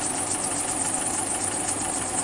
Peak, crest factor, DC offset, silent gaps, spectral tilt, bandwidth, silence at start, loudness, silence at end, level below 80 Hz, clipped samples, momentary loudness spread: -12 dBFS; 14 dB; under 0.1%; none; -2 dB/octave; 11.5 kHz; 0 s; -24 LUFS; 0 s; -52 dBFS; under 0.1%; 1 LU